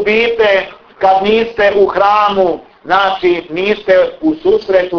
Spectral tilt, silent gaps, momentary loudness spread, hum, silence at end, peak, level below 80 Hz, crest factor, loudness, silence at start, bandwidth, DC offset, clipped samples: -6 dB/octave; none; 5 LU; none; 0 s; 0 dBFS; -46 dBFS; 12 dB; -12 LUFS; 0 s; 5.4 kHz; under 0.1%; under 0.1%